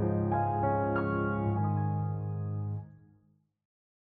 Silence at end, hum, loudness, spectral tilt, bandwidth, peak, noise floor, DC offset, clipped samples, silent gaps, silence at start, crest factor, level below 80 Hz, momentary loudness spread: 1.1 s; none; -32 LUFS; -12.5 dB/octave; 3.3 kHz; -18 dBFS; -68 dBFS; under 0.1%; under 0.1%; none; 0 s; 14 dB; -56 dBFS; 7 LU